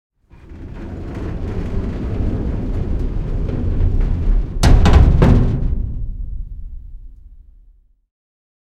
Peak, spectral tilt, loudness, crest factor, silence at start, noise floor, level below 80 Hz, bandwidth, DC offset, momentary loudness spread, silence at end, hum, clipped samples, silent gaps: 0 dBFS; -7.5 dB/octave; -19 LUFS; 16 dB; 0.45 s; -50 dBFS; -20 dBFS; 10 kHz; under 0.1%; 21 LU; 1.2 s; none; under 0.1%; none